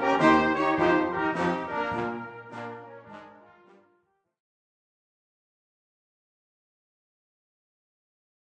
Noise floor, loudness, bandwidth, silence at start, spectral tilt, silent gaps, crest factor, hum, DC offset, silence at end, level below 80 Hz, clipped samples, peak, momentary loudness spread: -71 dBFS; -25 LUFS; 9 kHz; 0 s; -6 dB/octave; none; 24 dB; none; under 0.1%; 5.2 s; -60 dBFS; under 0.1%; -6 dBFS; 24 LU